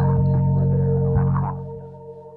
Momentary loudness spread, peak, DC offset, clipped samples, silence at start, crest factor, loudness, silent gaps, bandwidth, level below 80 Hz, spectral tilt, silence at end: 18 LU; -8 dBFS; under 0.1%; under 0.1%; 0 s; 12 dB; -20 LUFS; none; 2 kHz; -36 dBFS; -14 dB/octave; 0 s